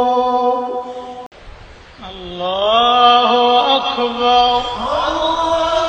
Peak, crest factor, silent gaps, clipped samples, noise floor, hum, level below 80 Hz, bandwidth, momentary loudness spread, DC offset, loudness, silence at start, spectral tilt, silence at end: 0 dBFS; 14 dB; 1.26-1.31 s; under 0.1%; -38 dBFS; none; -42 dBFS; 8.8 kHz; 20 LU; under 0.1%; -14 LUFS; 0 s; -3.5 dB/octave; 0 s